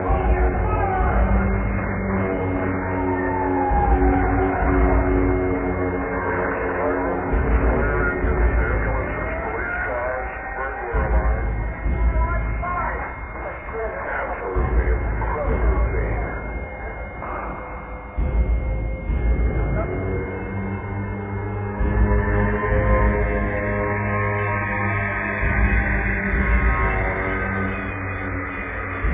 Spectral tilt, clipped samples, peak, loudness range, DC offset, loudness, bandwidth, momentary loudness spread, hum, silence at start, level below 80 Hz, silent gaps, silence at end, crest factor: -11.5 dB/octave; under 0.1%; -6 dBFS; 5 LU; under 0.1%; -23 LUFS; 3.8 kHz; 8 LU; none; 0 s; -24 dBFS; none; 0 s; 16 dB